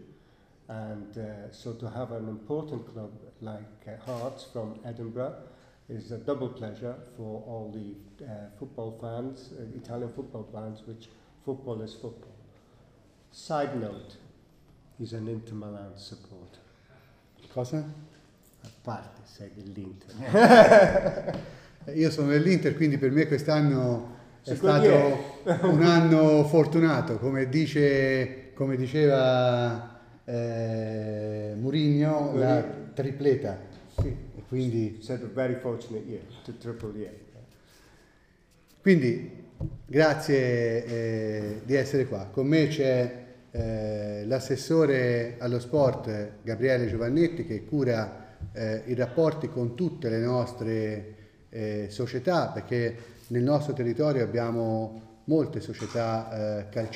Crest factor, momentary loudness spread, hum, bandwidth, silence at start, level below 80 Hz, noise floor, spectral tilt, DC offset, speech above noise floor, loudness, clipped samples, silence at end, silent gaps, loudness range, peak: 24 dB; 20 LU; none; 14.5 kHz; 0.7 s; -54 dBFS; -61 dBFS; -7 dB/octave; under 0.1%; 35 dB; -26 LUFS; under 0.1%; 0 s; none; 18 LU; -2 dBFS